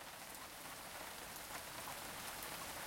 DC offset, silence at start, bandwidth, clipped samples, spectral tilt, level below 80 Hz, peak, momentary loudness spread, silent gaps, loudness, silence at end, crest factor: under 0.1%; 0 s; 16.5 kHz; under 0.1%; -1.5 dB/octave; -70 dBFS; -32 dBFS; 4 LU; none; -48 LUFS; 0 s; 18 dB